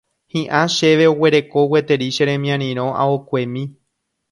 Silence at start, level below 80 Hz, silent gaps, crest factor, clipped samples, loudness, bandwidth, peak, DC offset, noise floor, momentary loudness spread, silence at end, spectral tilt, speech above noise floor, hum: 0.35 s; -62 dBFS; none; 16 dB; under 0.1%; -17 LUFS; 11.5 kHz; 0 dBFS; under 0.1%; -73 dBFS; 12 LU; 0.6 s; -5.5 dB/octave; 57 dB; none